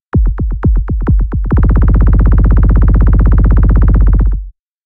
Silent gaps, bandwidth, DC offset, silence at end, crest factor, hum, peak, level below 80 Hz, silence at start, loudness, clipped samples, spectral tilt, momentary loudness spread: none; 2.3 kHz; under 0.1%; 0.35 s; 6 dB; none; -2 dBFS; -8 dBFS; 0.15 s; -11 LUFS; under 0.1%; -12.5 dB/octave; 5 LU